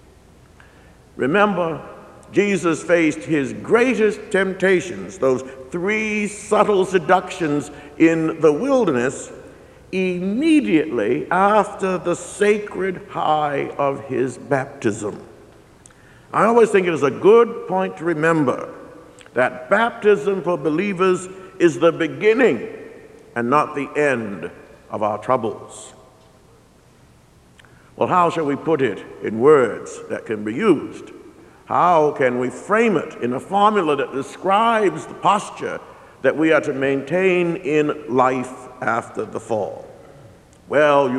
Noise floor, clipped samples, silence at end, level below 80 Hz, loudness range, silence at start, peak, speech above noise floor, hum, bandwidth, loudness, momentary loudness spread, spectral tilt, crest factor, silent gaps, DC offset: -51 dBFS; under 0.1%; 0 s; -56 dBFS; 5 LU; 1.15 s; 0 dBFS; 32 dB; none; 12 kHz; -19 LUFS; 13 LU; -5.5 dB/octave; 18 dB; none; under 0.1%